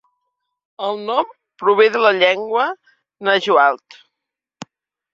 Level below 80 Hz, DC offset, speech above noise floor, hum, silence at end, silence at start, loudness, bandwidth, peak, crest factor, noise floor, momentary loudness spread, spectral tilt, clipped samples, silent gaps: -70 dBFS; under 0.1%; 66 dB; none; 1.4 s; 0.8 s; -17 LUFS; 7.6 kHz; 0 dBFS; 18 dB; -82 dBFS; 13 LU; -4 dB/octave; under 0.1%; none